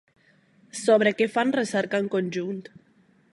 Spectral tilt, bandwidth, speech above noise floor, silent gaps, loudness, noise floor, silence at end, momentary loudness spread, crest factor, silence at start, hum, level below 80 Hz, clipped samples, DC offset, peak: -5 dB/octave; 11.5 kHz; 36 dB; none; -24 LUFS; -60 dBFS; 0.7 s; 13 LU; 18 dB; 0.75 s; none; -76 dBFS; under 0.1%; under 0.1%; -8 dBFS